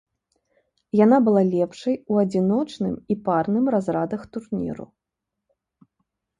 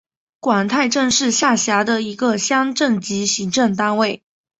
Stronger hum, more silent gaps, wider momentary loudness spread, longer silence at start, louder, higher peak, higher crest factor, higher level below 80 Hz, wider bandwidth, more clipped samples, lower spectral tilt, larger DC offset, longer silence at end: neither; neither; first, 12 LU vs 4 LU; first, 0.95 s vs 0.45 s; second, -22 LUFS vs -17 LUFS; about the same, -4 dBFS vs -2 dBFS; about the same, 18 dB vs 16 dB; about the same, -60 dBFS vs -60 dBFS; first, 10 kHz vs 8.4 kHz; neither; first, -8.5 dB/octave vs -3 dB/octave; neither; first, 1.55 s vs 0.45 s